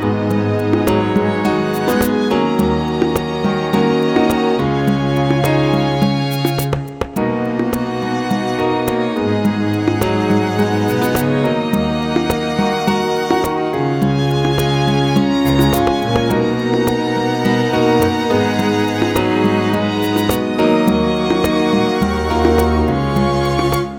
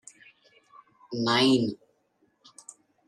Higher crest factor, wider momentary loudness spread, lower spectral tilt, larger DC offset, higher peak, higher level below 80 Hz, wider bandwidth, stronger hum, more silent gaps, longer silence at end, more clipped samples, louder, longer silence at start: about the same, 14 dB vs 18 dB; second, 4 LU vs 26 LU; first, -6.5 dB/octave vs -4.5 dB/octave; first, 0.2% vs under 0.1%; first, 0 dBFS vs -12 dBFS; first, -34 dBFS vs -74 dBFS; first, over 20 kHz vs 12 kHz; neither; neither; second, 0 s vs 1.3 s; neither; first, -16 LUFS vs -25 LUFS; second, 0 s vs 1.1 s